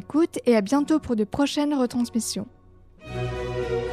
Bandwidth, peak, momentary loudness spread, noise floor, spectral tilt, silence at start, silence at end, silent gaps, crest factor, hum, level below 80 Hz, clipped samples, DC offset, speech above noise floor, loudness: 15 kHz; -8 dBFS; 11 LU; -50 dBFS; -5 dB/octave; 0.1 s; 0 s; none; 16 dB; none; -46 dBFS; under 0.1%; under 0.1%; 27 dB; -24 LUFS